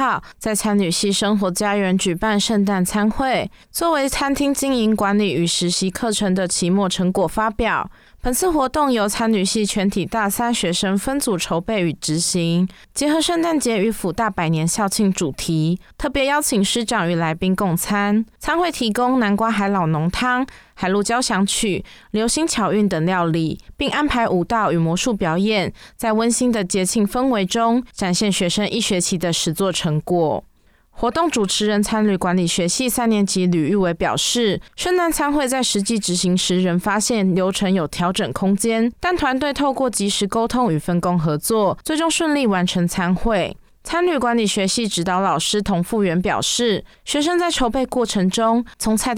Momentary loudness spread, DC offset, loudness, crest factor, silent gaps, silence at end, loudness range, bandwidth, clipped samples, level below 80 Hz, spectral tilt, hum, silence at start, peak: 4 LU; under 0.1%; -19 LUFS; 10 dB; none; 0 s; 1 LU; 17.5 kHz; under 0.1%; -42 dBFS; -4 dB/octave; none; 0 s; -8 dBFS